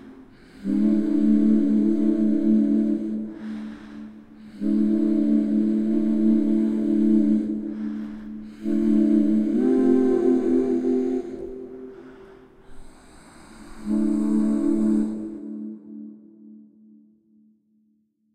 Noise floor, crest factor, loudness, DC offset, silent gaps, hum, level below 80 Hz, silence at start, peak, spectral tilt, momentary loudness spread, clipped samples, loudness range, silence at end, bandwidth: -67 dBFS; 14 dB; -22 LUFS; under 0.1%; none; none; -52 dBFS; 0.05 s; -8 dBFS; -9 dB/octave; 18 LU; under 0.1%; 8 LU; 1.75 s; 9 kHz